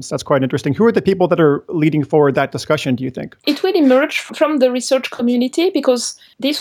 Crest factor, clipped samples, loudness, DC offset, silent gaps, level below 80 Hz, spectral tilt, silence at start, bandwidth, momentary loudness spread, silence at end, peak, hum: 14 dB; under 0.1%; -16 LUFS; under 0.1%; none; -56 dBFS; -5.5 dB/octave; 0 s; 19 kHz; 7 LU; 0 s; 0 dBFS; none